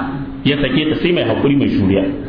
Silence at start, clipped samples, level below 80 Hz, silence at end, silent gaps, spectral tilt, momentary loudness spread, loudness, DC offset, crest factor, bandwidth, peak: 0 s; under 0.1%; -36 dBFS; 0 s; none; -9.5 dB/octave; 4 LU; -15 LUFS; under 0.1%; 12 dB; 5.2 kHz; -4 dBFS